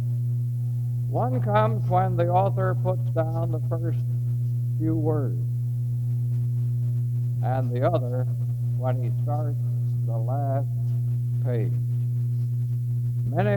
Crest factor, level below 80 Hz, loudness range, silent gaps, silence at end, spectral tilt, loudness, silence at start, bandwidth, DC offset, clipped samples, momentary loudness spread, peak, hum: 16 dB; -54 dBFS; 2 LU; none; 0 s; -10 dB/octave; -25 LUFS; 0 s; 3.9 kHz; under 0.1%; under 0.1%; 5 LU; -8 dBFS; 60 Hz at -30 dBFS